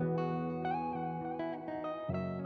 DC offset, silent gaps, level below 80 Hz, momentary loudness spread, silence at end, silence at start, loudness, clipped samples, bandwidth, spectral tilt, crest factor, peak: under 0.1%; none; -64 dBFS; 4 LU; 0 s; 0 s; -38 LUFS; under 0.1%; 4.9 kHz; -10 dB/octave; 12 dB; -24 dBFS